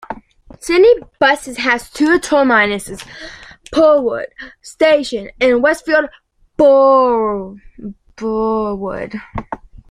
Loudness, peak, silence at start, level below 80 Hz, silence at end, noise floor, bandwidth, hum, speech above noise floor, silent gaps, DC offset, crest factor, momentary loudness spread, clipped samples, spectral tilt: -14 LUFS; 0 dBFS; 0.1 s; -44 dBFS; 0.35 s; -40 dBFS; 14.5 kHz; none; 26 dB; none; under 0.1%; 14 dB; 21 LU; under 0.1%; -4.5 dB/octave